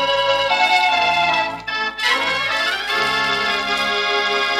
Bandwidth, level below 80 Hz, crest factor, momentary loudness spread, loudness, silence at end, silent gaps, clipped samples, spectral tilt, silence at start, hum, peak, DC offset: 16 kHz; -52 dBFS; 14 dB; 5 LU; -17 LUFS; 0 s; none; under 0.1%; -1.5 dB/octave; 0 s; 50 Hz at -50 dBFS; -4 dBFS; under 0.1%